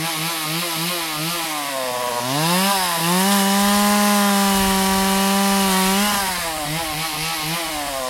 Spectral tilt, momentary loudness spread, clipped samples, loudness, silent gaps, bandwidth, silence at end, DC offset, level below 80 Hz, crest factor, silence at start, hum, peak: -3 dB/octave; 7 LU; under 0.1%; -18 LUFS; none; 16.5 kHz; 0 s; under 0.1%; -44 dBFS; 14 dB; 0 s; none; -4 dBFS